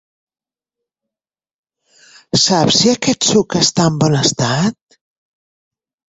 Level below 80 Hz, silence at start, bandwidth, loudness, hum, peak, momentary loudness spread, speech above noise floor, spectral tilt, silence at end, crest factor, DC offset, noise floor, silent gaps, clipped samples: -50 dBFS; 2.35 s; 8.2 kHz; -13 LUFS; none; 0 dBFS; 6 LU; over 76 dB; -4 dB/octave; 1.4 s; 18 dB; under 0.1%; under -90 dBFS; none; under 0.1%